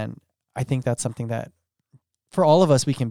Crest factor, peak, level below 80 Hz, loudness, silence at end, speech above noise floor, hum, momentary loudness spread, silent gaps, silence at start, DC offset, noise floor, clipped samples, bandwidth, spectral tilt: 18 dB; -6 dBFS; -60 dBFS; -22 LUFS; 0 s; 39 dB; none; 17 LU; none; 0 s; under 0.1%; -60 dBFS; under 0.1%; 15.5 kHz; -6 dB/octave